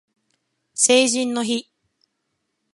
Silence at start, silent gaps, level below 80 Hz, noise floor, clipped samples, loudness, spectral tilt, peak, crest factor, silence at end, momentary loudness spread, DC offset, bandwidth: 0.75 s; none; -78 dBFS; -75 dBFS; under 0.1%; -18 LUFS; -1 dB/octave; -2 dBFS; 20 dB; 1.1 s; 12 LU; under 0.1%; 11.5 kHz